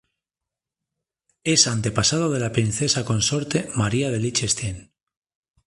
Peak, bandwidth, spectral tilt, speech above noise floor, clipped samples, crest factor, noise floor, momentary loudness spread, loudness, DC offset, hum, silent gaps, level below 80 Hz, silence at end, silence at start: 0 dBFS; 11.5 kHz; -3.5 dB/octave; 66 dB; under 0.1%; 24 dB; -87 dBFS; 7 LU; -21 LUFS; under 0.1%; none; none; -48 dBFS; 0.85 s; 1.45 s